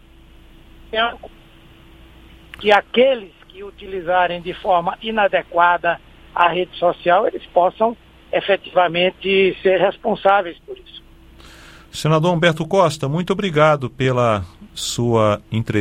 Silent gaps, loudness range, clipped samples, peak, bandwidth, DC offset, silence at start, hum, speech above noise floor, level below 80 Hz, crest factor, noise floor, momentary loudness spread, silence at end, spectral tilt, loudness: none; 3 LU; under 0.1%; 0 dBFS; 15.5 kHz; under 0.1%; 0.9 s; none; 28 dB; -48 dBFS; 18 dB; -45 dBFS; 13 LU; 0 s; -5.5 dB/octave; -18 LUFS